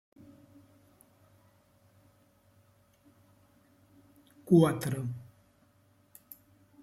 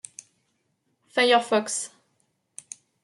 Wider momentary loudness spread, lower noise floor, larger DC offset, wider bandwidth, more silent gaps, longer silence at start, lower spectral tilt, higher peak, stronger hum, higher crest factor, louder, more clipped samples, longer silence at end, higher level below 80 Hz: first, 29 LU vs 25 LU; second, -66 dBFS vs -73 dBFS; neither; first, 16 kHz vs 11.5 kHz; neither; first, 4.45 s vs 1.15 s; first, -7.5 dB/octave vs -1.5 dB/octave; about the same, -10 dBFS vs -8 dBFS; neither; about the same, 24 dB vs 20 dB; second, -28 LUFS vs -23 LUFS; neither; first, 1.6 s vs 1.15 s; first, -72 dBFS vs -82 dBFS